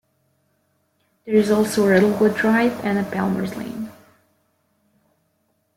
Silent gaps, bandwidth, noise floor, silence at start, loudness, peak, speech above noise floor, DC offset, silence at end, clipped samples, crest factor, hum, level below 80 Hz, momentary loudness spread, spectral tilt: none; 16.5 kHz; -68 dBFS; 1.25 s; -19 LUFS; -4 dBFS; 49 dB; under 0.1%; 1.85 s; under 0.1%; 18 dB; none; -60 dBFS; 15 LU; -6 dB/octave